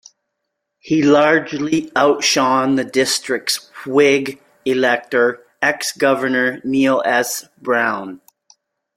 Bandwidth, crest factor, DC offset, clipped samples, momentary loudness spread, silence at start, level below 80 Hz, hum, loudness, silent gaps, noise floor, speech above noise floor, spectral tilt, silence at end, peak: 16.5 kHz; 16 dB; under 0.1%; under 0.1%; 7 LU; 0.85 s; -62 dBFS; none; -17 LUFS; none; -76 dBFS; 60 dB; -3.5 dB/octave; 0.8 s; -2 dBFS